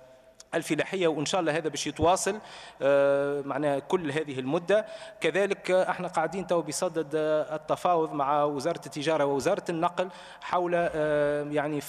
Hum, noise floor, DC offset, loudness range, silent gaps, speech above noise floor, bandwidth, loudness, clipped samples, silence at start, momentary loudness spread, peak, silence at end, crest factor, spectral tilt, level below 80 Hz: none; -54 dBFS; under 0.1%; 1 LU; none; 26 dB; 14 kHz; -28 LUFS; under 0.1%; 0 s; 6 LU; -12 dBFS; 0 s; 16 dB; -4.5 dB/octave; -62 dBFS